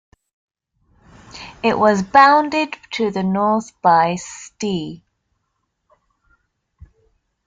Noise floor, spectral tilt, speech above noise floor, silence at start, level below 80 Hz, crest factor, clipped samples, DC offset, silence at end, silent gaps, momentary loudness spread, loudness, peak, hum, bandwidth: -72 dBFS; -5 dB/octave; 56 dB; 1.35 s; -56 dBFS; 20 dB; under 0.1%; under 0.1%; 2.5 s; none; 18 LU; -17 LUFS; 0 dBFS; none; 9.4 kHz